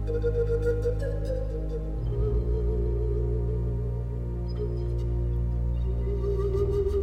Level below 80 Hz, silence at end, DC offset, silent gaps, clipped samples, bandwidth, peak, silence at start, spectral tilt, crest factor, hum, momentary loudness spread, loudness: -30 dBFS; 0 s; under 0.1%; none; under 0.1%; 5.4 kHz; -16 dBFS; 0 s; -9.5 dB/octave; 12 dB; none; 6 LU; -29 LUFS